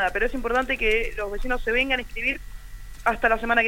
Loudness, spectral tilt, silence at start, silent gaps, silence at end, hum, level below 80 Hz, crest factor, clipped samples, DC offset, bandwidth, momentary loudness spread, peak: -24 LUFS; -4 dB/octave; 0 s; none; 0 s; 50 Hz at -50 dBFS; -34 dBFS; 18 dB; under 0.1%; 0.3%; 16.5 kHz; 9 LU; -6 dBFS